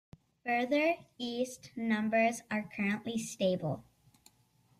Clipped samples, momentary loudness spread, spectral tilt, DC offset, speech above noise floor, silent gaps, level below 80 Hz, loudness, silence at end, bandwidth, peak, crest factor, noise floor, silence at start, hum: under 0.1%; 10 LU; -5 dB/octave; under 0.1%; 36 dB; none; -72 dBFS; -33 LUFS; 1 s; 14.5 kHz; -18 dBFS; 16 dB; -69 dBFS; 0.45 s; none